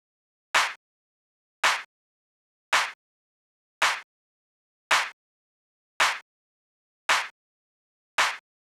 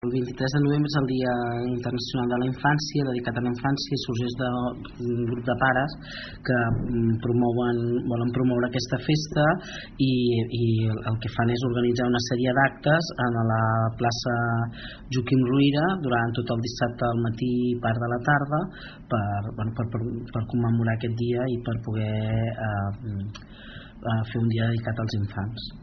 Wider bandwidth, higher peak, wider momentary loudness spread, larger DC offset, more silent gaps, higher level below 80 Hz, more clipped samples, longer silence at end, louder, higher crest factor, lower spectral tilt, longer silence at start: first, over 20 kHz vs 6.4 kHz; second, -12 dBFS vs -6 dBFS; about the same, 10 LU vs 8 LU; neither; first, 0.76-1.63 s, 1.85-2.72 s, 2.95-3.81 s, 4.04-4.90 s, 5.13-6.00 s, 6.22-7.09 s, 7.31-8.18 s vs none; second, -74 dBFS vs -48 dBFS; neither; first, 0.3 s vs 0 s; about the same, -26 LUFS vs -25 LUFS; about the same, 20 dB vs 18 dB; second, 2 dB/octave vs -5.5 dB/octave; first, 0.55 s vs 0.05 s